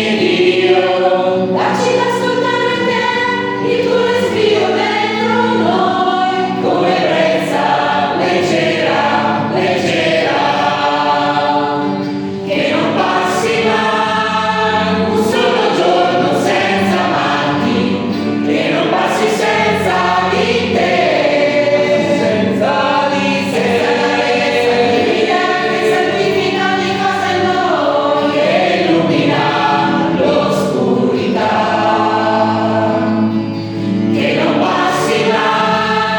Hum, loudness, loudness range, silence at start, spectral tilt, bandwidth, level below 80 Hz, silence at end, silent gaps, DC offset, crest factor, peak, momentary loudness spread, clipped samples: none; -13 LUFS; 1 LU; 0 s; -5 dB/octave; 18 kHz; -56 dBFS; 0 s; none; under 0.1%; 14 dB; 0 dBFS; 2 LU; under 0.1%